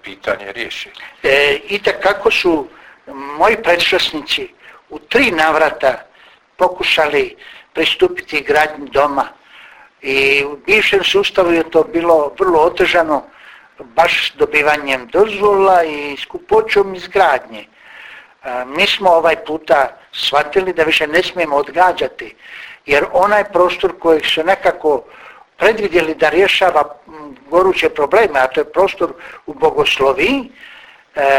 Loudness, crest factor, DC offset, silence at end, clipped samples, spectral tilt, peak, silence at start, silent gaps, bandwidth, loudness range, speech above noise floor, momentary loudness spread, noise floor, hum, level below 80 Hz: -14 LUFS; 14 dB; under 0.1%; 0 s; under 0.1%; -3.5 dB/octave; 0 dBFS; 0.05 s; none; 16.5 kHz; 2 LU; 33 dB; 15 LU; -47 dBFS; none; -46 dBFS